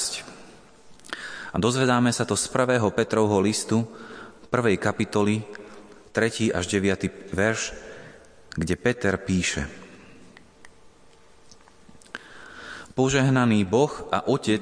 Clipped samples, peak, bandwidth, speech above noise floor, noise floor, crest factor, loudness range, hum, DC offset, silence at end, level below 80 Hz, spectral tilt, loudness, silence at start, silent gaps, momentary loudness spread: under 0.1%; -6 dBFS; 10.5 kHz; 29 dB; -52 dBFS; 18 dB; 8 LU; none; under 0.1%; 0 s; -52 dBFS; -5 dB/octave; -24 LUFS; 0 s; none; 20 LU